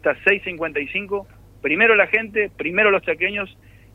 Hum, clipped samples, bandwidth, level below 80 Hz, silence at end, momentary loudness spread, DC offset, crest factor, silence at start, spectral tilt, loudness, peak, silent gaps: none; under 0.1%; 6 kHz; -52 dBFS; 0.45 s; 14 LU; under 0.1%; 18 dB; 0.05 s; -6 dB/octave; -19 LUFS; -2 dBFS; none